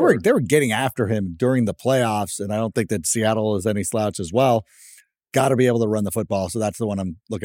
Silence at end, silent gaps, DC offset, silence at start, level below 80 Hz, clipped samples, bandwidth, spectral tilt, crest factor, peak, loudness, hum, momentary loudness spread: 0 s; none; under 0.1%; 0 s; -54 dBFS; under 0.1%; 17 kHz; -5.5 dB/octave; 18 dB; -2 dBFS; -21 LUFS; none; 7 LU